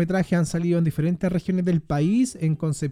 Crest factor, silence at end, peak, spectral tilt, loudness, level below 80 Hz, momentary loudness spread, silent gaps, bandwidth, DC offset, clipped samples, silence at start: 12 dB; 0 s; -10 dBFS; -7.5 dB/octave; -23 LUFS; -48 dBFS; 3 LU; none; 13.5 kHz; under 0.1%; under 0.1%; 0 s